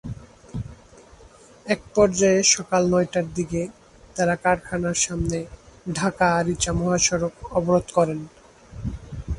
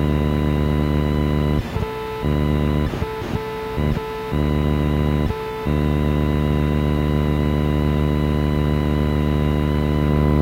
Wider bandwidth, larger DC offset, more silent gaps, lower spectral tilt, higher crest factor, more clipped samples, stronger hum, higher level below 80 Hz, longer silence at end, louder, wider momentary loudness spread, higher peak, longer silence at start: second, 11.5 kHz vs 16 kHz; neither; neither; second, -4 dB/octave vs -8 dB/octave; first, 20 dB vs 14 dB; neither; neither; second, -42 dBFS vs -26 dBFS; about the same, 0 s vs 0 s; about the same, -22 LUFS vs -20 LUFS; first, 19 LU vs 6 LU; about the same, -4 dBFS vs -6 dBFS; about the same, 0.05 s vs 0 s